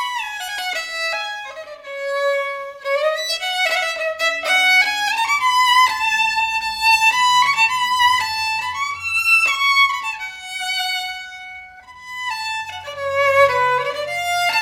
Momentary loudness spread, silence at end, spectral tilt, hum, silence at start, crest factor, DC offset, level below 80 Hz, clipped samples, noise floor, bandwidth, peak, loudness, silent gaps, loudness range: 14 LU; 0 s; 0.5 dB/octave; none; 0 s; 18 dB; under 0.1%; -58 dBFS; under 0.1%; -39 dBFS; 17 kHz; 0 dBFS; -17 LUFS; none; 7 LU